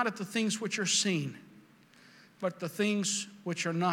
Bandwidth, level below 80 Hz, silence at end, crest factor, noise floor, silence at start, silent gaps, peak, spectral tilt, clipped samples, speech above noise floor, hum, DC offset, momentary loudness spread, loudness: 17 kHz; -88 dBFS; 0 s; 18 dB; -59 dBFS; 0 s; none; -14 dBFS; -3.5 dB/octave; under 0.1%; 27 dB; none; under 0.1%; 10 LU; -32 LUFS